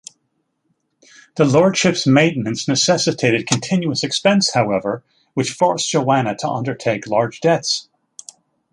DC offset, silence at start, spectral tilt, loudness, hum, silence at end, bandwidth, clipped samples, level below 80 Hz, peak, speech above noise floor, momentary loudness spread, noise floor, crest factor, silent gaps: under 0.1%; 1.35 s; -4.5 dB/octave; -17 LUFS; none; 0.9 s; 11.5 kHz; under 0.1%; -58 dBFS; 0 dBFS; 52 dB; 9 LU; -69 dBFS; 18 dB; none